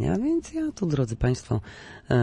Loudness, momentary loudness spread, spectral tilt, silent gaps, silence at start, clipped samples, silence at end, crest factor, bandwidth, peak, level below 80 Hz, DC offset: -27 LUFS; 8 LU; -7.5 dB/octave; none; 0 s; under 0.1%; 0 s; 14 dB; 10.5 kHz; -10 dBFS; -42 dBFS; under 0.1%